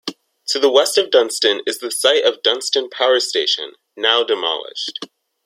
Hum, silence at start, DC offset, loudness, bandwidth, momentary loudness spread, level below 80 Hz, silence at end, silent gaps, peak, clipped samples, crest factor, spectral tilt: none; 0.05 s; under 0.1%; -17 LUFS; 16 kHz; 12 LU; -72 dBFS; 0.4 s; none; 0 dBFS; under 0.1%; 18 dB; 0 dB/octave